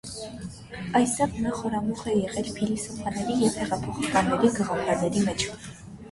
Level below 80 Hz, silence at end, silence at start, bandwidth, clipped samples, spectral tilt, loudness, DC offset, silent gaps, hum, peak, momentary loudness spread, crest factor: -50 dBFS; 0 s; 0.05 s; 11.5 kHz; under 0.1%; -5 dB/octave; -26 LUFS; under 0.1%; none; none; -8 dBFS; 14 LU; 20 dB